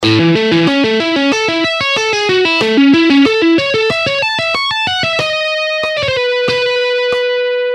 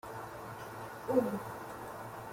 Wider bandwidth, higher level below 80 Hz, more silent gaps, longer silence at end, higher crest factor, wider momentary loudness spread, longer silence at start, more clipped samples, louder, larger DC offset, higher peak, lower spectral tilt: second, 11 kHz vs 16.5 kHz; first, -50 dBFS vs -66 dBFS; neither; about the same, 0 s vs 0 s; second, 12 dB vs 22 dB; second, 5 LU vs 13 LU; about the same, 0 s vs 0.05 s; neither; first, -12 LUFS vs -39 LUFS; neither; first, 0 dBFS vs -16 dBFS; second, -4.5 dB/octave vs -6.5 dB/octave